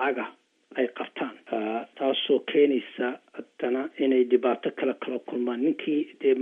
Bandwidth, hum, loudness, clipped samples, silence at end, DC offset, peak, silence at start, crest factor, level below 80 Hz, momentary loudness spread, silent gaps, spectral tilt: 3.8 kHz; none; -27 LUFS; under 0.1%; 0 s; under 0.1%; -8 dBFS; 0 s; 18 dB; under -90 dBFS; 11 LU; none; -7 dB/octave